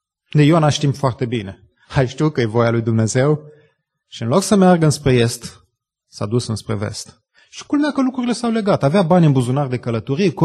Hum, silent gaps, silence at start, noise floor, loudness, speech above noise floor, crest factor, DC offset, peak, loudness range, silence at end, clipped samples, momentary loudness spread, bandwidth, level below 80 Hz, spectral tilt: none; none; 0.35 s; -65 dBFS; -17 LUFS; 49 dB; 16 dB; under 0.1%; -2 dBFS; 5 LU; 0 s; under 0.1%; 15 LU; 12.5 kHz; -48 dBFS; -6.5 dB/octave